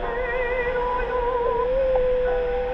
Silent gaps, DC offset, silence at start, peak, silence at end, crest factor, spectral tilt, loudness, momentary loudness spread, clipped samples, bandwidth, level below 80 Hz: none; under 0.1%; 0 s; -10 dBFS; 0 s; 12 dB; -7 dB/octave; -23 LUFS; 3 LU; under 0.1%; 5.6 kHz; -34 dBFS